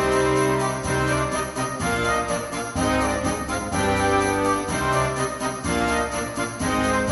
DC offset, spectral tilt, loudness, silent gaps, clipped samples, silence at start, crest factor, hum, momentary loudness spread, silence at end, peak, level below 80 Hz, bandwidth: under 0.1%; -4.5 dB/octave; -23 LUFS; none; under 0.1%; 0 s; 14 dB; none; 6 LU; 0 s; -8 dBFS; -38 dBFS; 11.5 kHz